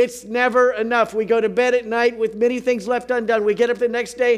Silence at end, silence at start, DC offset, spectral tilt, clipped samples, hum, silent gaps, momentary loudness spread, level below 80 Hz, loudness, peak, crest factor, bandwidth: 0 s; 0 s; under 0.1%; -4 dB/octave; under 0.1%; none; none; 4 LU; -58 dBFS; -19 LUFS; -4 dBFS; 16 dB; 13 kHz